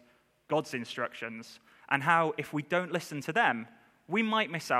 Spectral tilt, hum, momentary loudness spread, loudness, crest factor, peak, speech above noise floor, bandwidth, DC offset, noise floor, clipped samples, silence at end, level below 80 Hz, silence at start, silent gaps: -5 dB/octave; none; 14 LU; -31 LUFS; 22 dB; -10 dBFS; 33 dB; 15.5 kHz; under 0.1%; -64 dBFS; under 0.1%; 0 s; -80 dBFS; 0.5 s; none